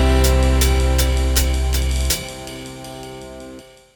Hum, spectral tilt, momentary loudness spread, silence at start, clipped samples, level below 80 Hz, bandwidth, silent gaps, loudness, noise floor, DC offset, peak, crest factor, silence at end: none; -4.5 dB/octave; 18 LU; 0 s; under 0.1%; -20 dBFS; over 20 kHz; none; -18 LUFS; -40 dBFS; under 0.1%; -4 dBFS; 14 dB; 0.35 s